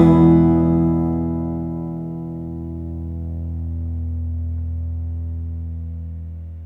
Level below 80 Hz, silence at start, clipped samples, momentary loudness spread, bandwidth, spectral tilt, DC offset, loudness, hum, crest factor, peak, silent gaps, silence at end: -32 dBFS; 0 s; under 0.1%; 15 LU; 3.9 kHz; -11.5 dB/octave; under 0.1%; -21 LUFS; none; 18 dB; -2 dBFS; none; 0 s